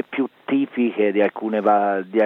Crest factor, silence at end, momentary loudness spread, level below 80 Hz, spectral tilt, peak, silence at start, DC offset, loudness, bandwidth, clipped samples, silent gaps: 14 dB; 0 s; 5 LU; -76 dBFS; -8.5 dB/octave; -6 dBFS; 0.1 s; under 0.1%; -21 LUFS; 4.2 kHz; under 0.1%; none